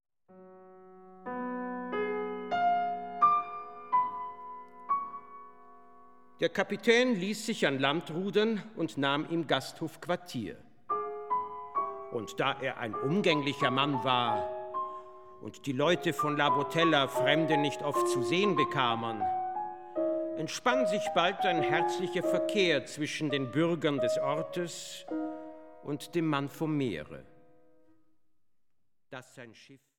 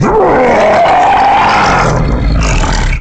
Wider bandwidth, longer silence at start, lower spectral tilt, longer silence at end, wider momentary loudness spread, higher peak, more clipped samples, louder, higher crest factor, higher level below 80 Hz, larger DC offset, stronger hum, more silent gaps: first, 17.5 kHz vs 9 kHz; first, 0.3 s vs 0 s; about the same, -5 dB/octave vs -5.5 dB/octave; first, 0.2 s vs 0 s; first, 15 LU vs 5 LU; second, -10 dBFS vs -2 dBFS; neither; second, -31 LUFS vs -8 LUFS; first, 22 dB vs 6 dB; second, -74 dBFS vs -16 dBFS; first, 0.2% vs under 0.1%; neither; neither